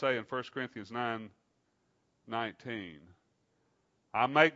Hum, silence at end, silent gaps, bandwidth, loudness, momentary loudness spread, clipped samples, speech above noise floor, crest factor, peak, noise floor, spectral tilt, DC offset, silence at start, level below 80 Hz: none; 0 s; none; 7.6 kHz; -35 LUFS; 12 LU; under 0.1%; 43 dB; 28 dB; -8 dBFS; -76 dBFS; -2.5 dB/octave; under 0.1%; 0 s; -80 dBFS